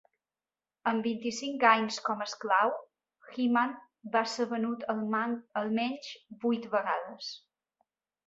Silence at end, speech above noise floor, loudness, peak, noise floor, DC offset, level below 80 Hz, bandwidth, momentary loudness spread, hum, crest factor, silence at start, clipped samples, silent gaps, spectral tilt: 0.9 s; over 59 dB; -31 LUFS; -8 dBFS; under -90 dBFS; under 0.1%; -80 dBFS; 8 kHz; 15 LU; none; 24 dB; 0.85 s; under 0.1%; none; -4 dB/octave